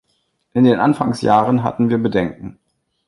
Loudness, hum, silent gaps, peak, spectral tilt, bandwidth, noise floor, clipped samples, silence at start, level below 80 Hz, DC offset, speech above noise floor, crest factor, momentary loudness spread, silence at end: -16 LUFS; none; none; 0 dBFS; -7.5 dB/octave; 11.5 kHz; -66 dBFS; under 0.1%; 0.55 s; -50 dBFS; under 0.1%; 51 dB; 16 dB; 12 LU; 0.55 s